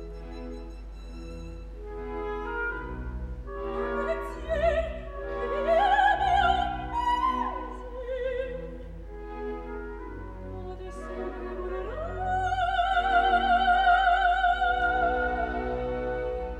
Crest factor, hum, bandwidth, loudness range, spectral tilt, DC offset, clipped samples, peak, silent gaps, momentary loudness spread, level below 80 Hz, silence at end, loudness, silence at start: 18 dB; none; 9.8 kHz; 13 LU; -5.5 dB/octave; under 0.1%; under 0.1%; -10 dBFS; none; 18 LU; -40 dBFS; 0 s; -27 LUFS; 0 s